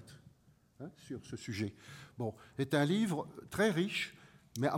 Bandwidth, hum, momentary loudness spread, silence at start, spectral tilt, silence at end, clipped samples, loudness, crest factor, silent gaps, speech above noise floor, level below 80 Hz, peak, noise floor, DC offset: 16.5 kHz; none; 20 LU; 0 s; -5.5 dB/octave; 0 s; under 0.1%; -36 LUFS; 20 dB; none; 31 dB; -70 dBFS; -18 dBFS; -67 dBFS; under 0.1%